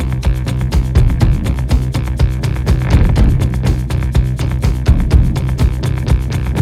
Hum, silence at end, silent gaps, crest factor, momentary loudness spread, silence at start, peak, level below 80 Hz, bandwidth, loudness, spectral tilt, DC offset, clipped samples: none; 0 s; none; 12 dB; 5 LU; 0 s; 0 dBFS; -16 dBFS; 13.5 kHz; -15 LUFS; -7 dB/octave; under 0.1%; under 0.1%